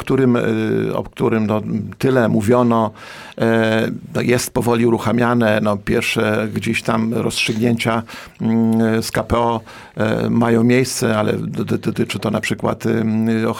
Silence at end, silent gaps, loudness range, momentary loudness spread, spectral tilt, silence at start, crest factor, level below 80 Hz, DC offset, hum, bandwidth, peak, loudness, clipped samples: 0 s; none; 1 LU; 7 LU; -6 dB/octave; 0 s; 14 dB; -46 dBFS; 0.1%; none; 17 kHz; -4 dBFS; -18 LUFS; under 0.1%